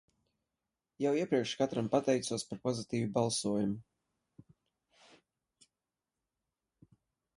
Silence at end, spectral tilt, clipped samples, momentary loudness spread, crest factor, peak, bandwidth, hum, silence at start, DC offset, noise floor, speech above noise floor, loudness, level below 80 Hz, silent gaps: 3.55 s; -5 dB/octave; under 0.1%; 6 LU; 22 dB; -16 dBFS; 11.5 kHz; none; 1 s; under 0.1%; under -90 dBFS; over 57 dB; -34 LUFS; -72 dBFS; none